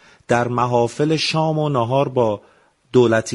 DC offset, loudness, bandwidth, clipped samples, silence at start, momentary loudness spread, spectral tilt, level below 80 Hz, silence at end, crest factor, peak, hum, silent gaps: under 0.1%; -18 LUFS; 11.5 kHz; under 0.1%; 0.3 s; 4 LU; -6 dB/octave; -56 dBFS; 0 s; 18 dB; -2 dBFS; none; none